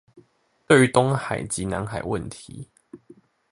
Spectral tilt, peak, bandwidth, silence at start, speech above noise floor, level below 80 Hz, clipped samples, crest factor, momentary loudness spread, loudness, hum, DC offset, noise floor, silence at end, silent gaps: -5 dB/octave; -2 dBFS; 11.5 kHz; 0.15 s; 41 dB; -50 dBFS; under 0.1%; 22 dB; 24 LU; -22 LUFS; none; under 0.1%; -63 dBFS; 0.55 s; none